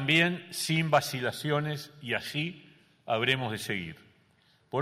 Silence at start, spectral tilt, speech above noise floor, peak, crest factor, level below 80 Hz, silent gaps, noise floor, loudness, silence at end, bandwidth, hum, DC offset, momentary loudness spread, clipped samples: 0 s; -4.5 dB/octave; 36 dB; -10 dBFS; 20 dB; -68 dBFS; none; -66 dBFS; -30 LUFS; 0 s; 16 kHz; none; under 0.1%; 11 LU; under 0.1%